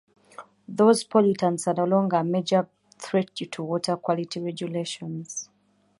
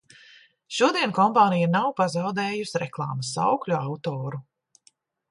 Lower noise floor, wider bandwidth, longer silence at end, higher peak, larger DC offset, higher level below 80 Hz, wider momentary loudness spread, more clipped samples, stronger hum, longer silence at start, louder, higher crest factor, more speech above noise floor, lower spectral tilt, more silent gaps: about the same, -66 dBFS vs -63 dBFS; about the same, 11.5 kHz vs 11.5 kHz; second, 0.55 s vs 0.9 s; about the same, -6 dBFS vs -6 dBFS; neither; about the same, -72 dBFS vs -70 dBFS; first, 15 LU vs 11 LU; neither; neither; second, 0.4 s vs 0.7 s; about the same, -25 LUFS vs -24 LUFS; about the same, 20 dB vs 20 dB; about the same, 42 dB vs 40 dB; about the same, -5.5 dB/octave vs -5 dB/octave; neither